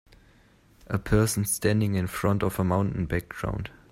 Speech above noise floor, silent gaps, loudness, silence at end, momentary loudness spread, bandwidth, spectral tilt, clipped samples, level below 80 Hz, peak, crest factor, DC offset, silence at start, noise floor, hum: 33 dB; none; -27 LUFS; 0.2 s; 9 LU; 16 kHz; -5.5 dB/octave; under 0.1%; -42 dBFS; -6 dBFS; 20 dB; under 0.1%; 0.9 s; -58 dBFS; none